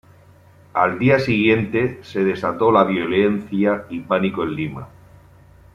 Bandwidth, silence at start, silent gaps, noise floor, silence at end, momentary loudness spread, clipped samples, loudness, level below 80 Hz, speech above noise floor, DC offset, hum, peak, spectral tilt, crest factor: 12 kHz; 0.75 s; none; -49 dBFS; 0.9 s; 9 LU; under 0.1%; -19 LUFS; -54 dBFS; 30 dB; under 0.1%; none; -2 dBFS; -8 dB/octave; 18 dB